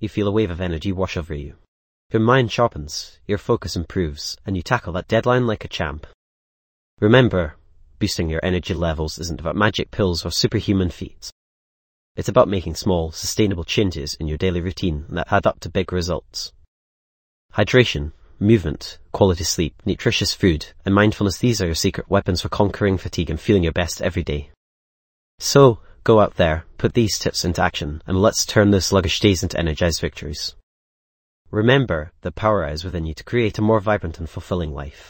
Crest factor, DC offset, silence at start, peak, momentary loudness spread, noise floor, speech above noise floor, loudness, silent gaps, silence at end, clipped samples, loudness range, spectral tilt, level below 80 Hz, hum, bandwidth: 20 dB; under 0.1%; 0 s; 0 dBFS; 12 LU; under -90 dBFS; over 70 dB; -20 LUFS; 1.68-2.10 s, 6.14-6.97 s, 11.32-12.15 s, 16.68-17.49 s, 24.57-25.38 s, 30.63-31.45 s; 0.1 s; under 0.1%; 4 LU; -5 dB/octave; -36 dBFS; none; 17 kHz